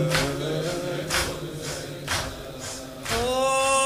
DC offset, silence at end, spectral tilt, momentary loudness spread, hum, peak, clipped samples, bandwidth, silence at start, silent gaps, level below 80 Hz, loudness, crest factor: under 0.1%; 0 s; -3.5 dB/octave; 12 LU; none; -6 dBFS; under 0.1%; 16 kHz; 0 s; none; -44 dBFS; -27 LUFS; 20 dB